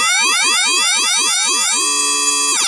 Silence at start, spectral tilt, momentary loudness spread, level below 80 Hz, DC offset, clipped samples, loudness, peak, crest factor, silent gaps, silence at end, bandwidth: 0 s; 3 dB/octave; 1 LU; -90 dBFS; under 0.1%; under 0.1%; -12 LUFS; -4 dBFS; 12 dB; none; 0 s; 11.5 kHz